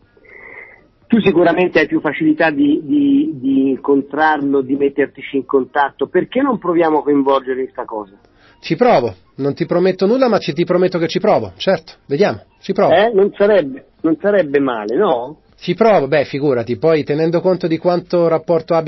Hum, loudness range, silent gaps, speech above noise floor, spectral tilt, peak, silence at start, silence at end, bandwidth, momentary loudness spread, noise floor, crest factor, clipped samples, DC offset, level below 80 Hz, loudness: none; 2 LU; none; 28 dB; -5 dB/octave; -2 dBFS; 0.45 s; 0 s; 6 kHz; 10 LU; -43 dBFS; 14 dB; under 0.1%; under 0.1%; -54 dBFS; -15 LUFS